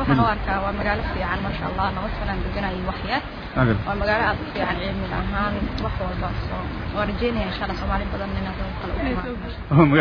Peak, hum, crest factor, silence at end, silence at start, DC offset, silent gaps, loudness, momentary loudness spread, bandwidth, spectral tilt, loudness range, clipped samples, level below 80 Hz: -2 dBFS; none; 22 dB; 0 s; 0 s; under 0.1%; none; -24 LUFS; 7 LU; 5.4 kHz; -8.5 dB/octave; 2 LU; under 0.1%; -32 dBFS